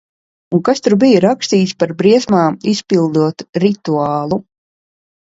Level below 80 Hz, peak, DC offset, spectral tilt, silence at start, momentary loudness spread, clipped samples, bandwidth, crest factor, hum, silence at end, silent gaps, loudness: -56 dBFS; 0 dBFS; under 0.1%; -6 dB/octave; 0.5 s; 8 LU; under 0.1%; 8 kHz; 14 dB; none; 0.85 s; 3.49-3.53 s; -14 LUFS